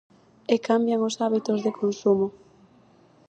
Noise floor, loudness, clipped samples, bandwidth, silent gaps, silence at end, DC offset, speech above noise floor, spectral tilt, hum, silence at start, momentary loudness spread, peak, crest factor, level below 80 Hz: -57 dBFS; -24 LUFS; under 0.1%; 8.8 kHz; none; 1 s; under 0.1%; 33 dB; -5.5 dB/octave; none; 0.5 s; 4 LU; -6 dBFS; 20 dB; -70 dBFS